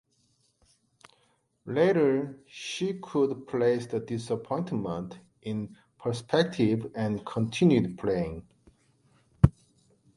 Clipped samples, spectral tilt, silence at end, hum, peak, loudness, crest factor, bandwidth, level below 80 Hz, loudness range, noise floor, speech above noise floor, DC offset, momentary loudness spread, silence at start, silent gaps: under 0.1%; -7 dB/octave; 0.65 s; none; -4 dBFS; -28 LUFS; 26 dB; 11.5 kHz; -48 dBFS; 3 LU; -70 dBFS; 42 dB; under 0.1%; 13 LU; 1.65 s; none